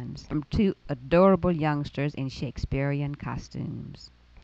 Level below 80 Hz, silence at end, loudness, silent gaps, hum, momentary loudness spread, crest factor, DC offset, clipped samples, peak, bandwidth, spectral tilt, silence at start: -44 dBFS; 0.35 s; -27 LUFS; none; none; 15 LU; 20 dB; under 0.1%; under 0.1%; -8 dBFS; 7.6 kHz; -8 dB/octave; 0 s